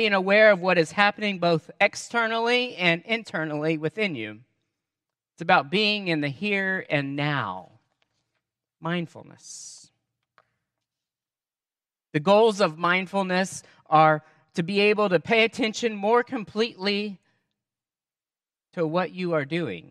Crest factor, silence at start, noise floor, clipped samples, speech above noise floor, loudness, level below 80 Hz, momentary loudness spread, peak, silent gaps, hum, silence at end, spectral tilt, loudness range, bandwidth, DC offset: 22 dB; 0 s; under -90 dBFS; under 0.1%; over 66 dB; -23 LUFS; -74 dBFS; 15 LU; -4 dBFS; none; none; 0.1 s; -5 dB/octave; 14 LU; 12 kHz; under 0.1%